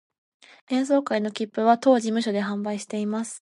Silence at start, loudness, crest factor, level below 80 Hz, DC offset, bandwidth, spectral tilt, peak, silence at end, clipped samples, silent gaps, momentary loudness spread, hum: 0.7 s; -24 LUFS; 20 dB; -78 dBFS; under 0.1%; 11.5 kHz; -5 dB/octave; -6 dBFS; 0.2 s; under 0.1%; none; 9 LU; none